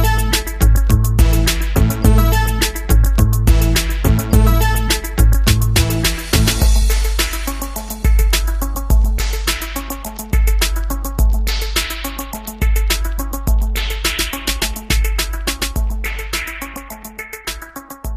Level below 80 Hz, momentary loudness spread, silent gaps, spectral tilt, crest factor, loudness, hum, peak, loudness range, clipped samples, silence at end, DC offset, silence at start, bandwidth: -16 dBFS; 11 LU; none; -4 dB/octave; 14 dB; -17 LUFS; none; 0 dBFS; 5 LU; under 0.1%; 0 s; under 0.1%; 0 s; 15.5 kHz